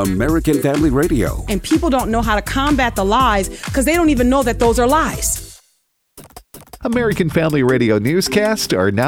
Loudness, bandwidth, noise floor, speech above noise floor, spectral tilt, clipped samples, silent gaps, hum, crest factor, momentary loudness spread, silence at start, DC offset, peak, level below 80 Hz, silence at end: -16 LUFS; 18 kHz; -64 dBFS; 48 dB; -5 dB/octave; under 0.1%; none; none; 14 dB; 5 LU; 0 s; under 0.1%; -2 dBFS; -28 dBFS; 0 s